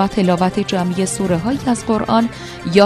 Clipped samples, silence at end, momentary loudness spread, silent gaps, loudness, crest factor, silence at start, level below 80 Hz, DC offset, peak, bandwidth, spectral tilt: under 0.1%; 0 s; 3 LU; none; -17 LUFS; 16 dB; 0 s; -42 dBFS; under 0.1%; 0 dBFS; 13 kHz; -5.5 dB/octave